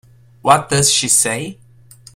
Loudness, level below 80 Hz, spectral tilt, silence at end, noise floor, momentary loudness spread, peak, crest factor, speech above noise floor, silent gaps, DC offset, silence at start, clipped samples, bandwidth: -14 LUFS; -50 dBFS; -2 dB/octave; 0.65 s; -44 dBFS; 12 LU; 0 dBFS; 18 dB; 29 dB; none; under 0.1%; 0.45 s; under 0.1%; 16.5 kHz